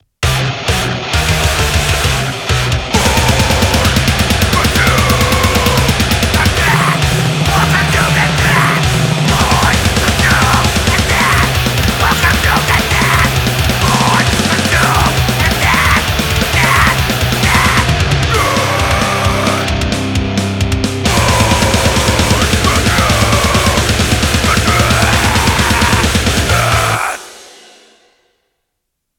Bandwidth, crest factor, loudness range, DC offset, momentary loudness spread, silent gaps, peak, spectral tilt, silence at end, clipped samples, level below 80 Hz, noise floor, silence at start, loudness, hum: 19.5 kHz; 12 dB; 2 LU; under 0.1%; 4 LU; none; 0 dBFS; -4 dB/octave; 1.7 s; under 0.1%; -22 dBFS; -72 dBFS; 0.2 s; -11 LUFS; none